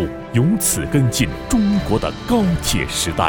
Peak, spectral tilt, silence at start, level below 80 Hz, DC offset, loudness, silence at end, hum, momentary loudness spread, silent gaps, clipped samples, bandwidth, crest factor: 0 dBFS; -4.5 dB/octave; 0 s; -32 dBFS; under 0.1%; -18 LUFS; 0 s; none; 4 LU; none; under 0.1%; 19 kHz; 18 dB